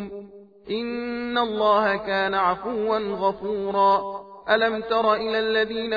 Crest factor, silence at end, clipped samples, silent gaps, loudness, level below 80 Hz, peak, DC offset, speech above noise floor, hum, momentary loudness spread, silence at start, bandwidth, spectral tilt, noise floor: 18 dB; 0 s; under 0.1%; none; -23 LUFS; -58 dBFS; -6 dBFS; under 0.1%; 20 dB; none; 10 LU; 0 s; 5 kHz; -6.5 dB/octave; -43 dBFS